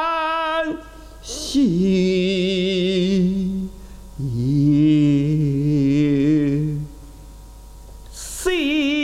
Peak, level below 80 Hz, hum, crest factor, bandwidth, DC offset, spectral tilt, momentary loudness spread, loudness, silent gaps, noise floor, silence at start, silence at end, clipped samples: -6 dBFS; -40 dBFS; none; 12 dB; 14 kHz; under 0.1%; -6 dB/octave; 15 LU; -19 LUFS; none; -39 dBFS; 0 s; 0 s; under 0.1%